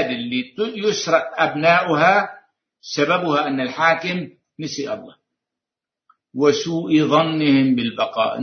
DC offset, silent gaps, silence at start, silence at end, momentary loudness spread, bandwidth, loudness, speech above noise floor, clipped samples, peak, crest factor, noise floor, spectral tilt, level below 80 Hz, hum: under 0.1%; none; 0 s; 0 s; 13 LU; 6.6 kHz; -19 LUFS; 69 dB; under 0.1%; -2 dBFS; 18 dB; -87 dBFS; -5 dB/octave; -64 dBFS; none